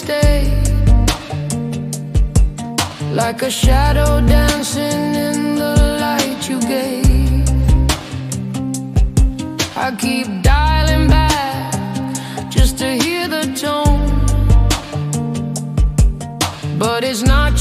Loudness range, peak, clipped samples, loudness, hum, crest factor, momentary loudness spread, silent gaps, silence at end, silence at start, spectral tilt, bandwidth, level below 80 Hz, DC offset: 2 LU; 0 dBFS; under 0.1%; -16 LUFS; none; 14 dB; 8 LU; none; 0 s; 0 s; -5 dB/octave; 15.5 kHz; -18 dBFS; under 0.1%